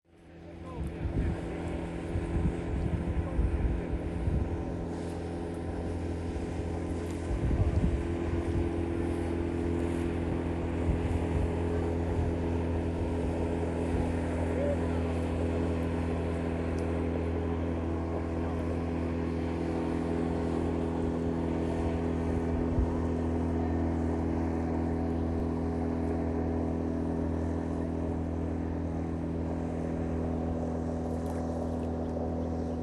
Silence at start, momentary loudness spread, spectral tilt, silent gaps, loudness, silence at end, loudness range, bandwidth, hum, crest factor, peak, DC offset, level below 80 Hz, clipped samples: 0.2 s; 4 LU; -8.5 dB/octave; none; -32 LUFS; 0 s; 3 LU; 11 kHz; none; 16 dB; -16 dBFS; under 0.1%; -38 dBFS; under 0.1%